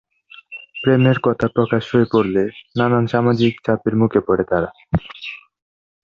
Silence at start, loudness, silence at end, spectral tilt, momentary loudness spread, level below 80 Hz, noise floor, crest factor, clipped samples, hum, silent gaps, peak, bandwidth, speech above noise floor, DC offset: 0.5 s; -18 LUFS; 0.65 s; -8.5 dB/octave; 16 LU; -44 dBFS; -43 dBFS; 16 dB; under 0.1%; none; none; -2 dBFS; 7 kHz; 26 dB; under 0.1%